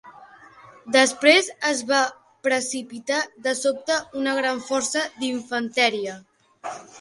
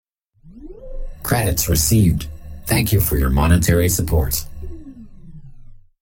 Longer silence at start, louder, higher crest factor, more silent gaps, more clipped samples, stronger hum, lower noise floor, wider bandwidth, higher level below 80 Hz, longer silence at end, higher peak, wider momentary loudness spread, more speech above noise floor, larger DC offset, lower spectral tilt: second, 0.05 s vs 0.45 s; second, -22 LUFS vs -17 LUFS; about the same, 22 dB vs 18 dB; neither; neither; neither; about the same, -48 dBFS vs -48 dBFS; second, 11.5 kHz vs 17 kHz; second, -70 dBFS vs -26 dBFS; second, 0 s vs 0.25 s; about the same, -2 dBFS vs -2 dBFS; second, 14 LU vs 22 LU; second, 25 dB vs 32 dB; neither; second, -1 dB/octave vs -5 dB/octave